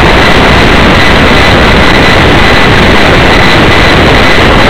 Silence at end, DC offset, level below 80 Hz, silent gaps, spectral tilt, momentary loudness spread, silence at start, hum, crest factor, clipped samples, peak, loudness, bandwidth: 0 s; 20%; -12 dBFS; none; -5 dB/octave; 0 LU; 0 s; none; 4 dB; 20%; 0 dBFS; -3 LUFS; over 20 kHz